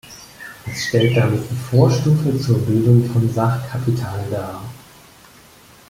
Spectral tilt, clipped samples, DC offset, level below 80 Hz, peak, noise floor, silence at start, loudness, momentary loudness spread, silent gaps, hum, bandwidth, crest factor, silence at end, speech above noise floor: -7 dB/octave; under 0.1%; under 0.1%; -48 dBFS; -2 dBFS; -46 dBFS; 0.05 s; -18 LUFS; 19 LU; none; none; 16 kHz; 16 dB; 1.15 s; 29 dB